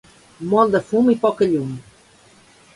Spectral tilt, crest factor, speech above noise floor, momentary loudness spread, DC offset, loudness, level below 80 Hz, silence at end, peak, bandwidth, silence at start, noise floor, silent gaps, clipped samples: -7.5 dB/octave; 18 dB; 33 dB; 15 LU; under 0.1%; -18 LUFS; -58 dBFS; 0.95 s; -2 dBFS; 11.5 kHz; 0.4 s; -51 dBFS; none; under 0.1%